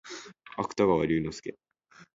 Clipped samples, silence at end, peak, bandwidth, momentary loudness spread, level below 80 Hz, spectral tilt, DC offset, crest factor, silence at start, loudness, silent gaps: under 0.1%; 0.65 s; -12 dBFS; 7.8 kHz; 18 LU; -56 dBFS; -6 dB/octave; under 0.1%; 20 dB; 0.05 s; -28 LUFS; none